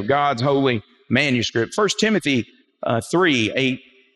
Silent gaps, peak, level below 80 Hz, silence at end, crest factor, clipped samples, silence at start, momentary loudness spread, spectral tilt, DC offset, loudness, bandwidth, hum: none; -4 dBFS; -62 dBFS; 0.4 s; 16 dB; under 0.1%; 0 s; 7 LU; -4.5 dB/octave; under 0.1%; -20 LUFS; 12.5 kHz; none